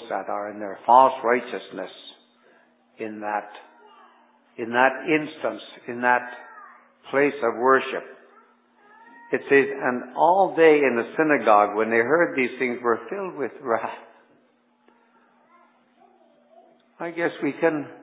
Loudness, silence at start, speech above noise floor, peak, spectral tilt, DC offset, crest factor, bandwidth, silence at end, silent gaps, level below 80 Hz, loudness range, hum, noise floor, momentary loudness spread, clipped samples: -22 LUFS; 0 s; 41 dB; -2 dBFS; -8.5 dB/octave; under 0.1%; 22 dB; 4 kHz; 0.05 s; none; -84 dBFS; 14 LU; none; -63 dBFS; 19 LU; under 0.1%